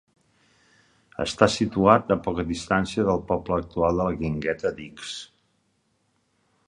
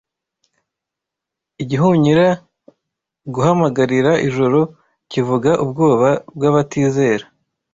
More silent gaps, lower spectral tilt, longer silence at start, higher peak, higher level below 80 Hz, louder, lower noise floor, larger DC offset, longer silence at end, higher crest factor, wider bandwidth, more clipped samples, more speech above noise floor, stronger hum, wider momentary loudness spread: neither; second, -5.5 dB/octave vs -7 dB/octave; second, 1.2 s vs 1.6 s; about the same, 0 dBFS vs -2 dBFS; first, -46 dBFS vs -54 dBFS; second, -24 LUFS vs -16 LUFS; second, -70 dBFS vs -83 dBFS; neither; first, 1.45 s vs 0.5 s; first, 24 dB vs 14 dB; first, 11 kHz vs 7.8 kHz; neither; second, 46 dB vs 69 dB; neither; first, 16 LU vs 10 LU